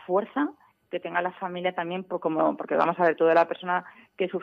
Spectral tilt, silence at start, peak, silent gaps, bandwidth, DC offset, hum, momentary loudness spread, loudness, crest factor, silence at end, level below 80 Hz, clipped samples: -7.5 dB/octave; 0 s; -8 dBFS; none; 6.4 kHz; under 0.1%; none; 11 LU; -26 LUFS; 20 dB; 0 s; -76 dBFS; under 0.1%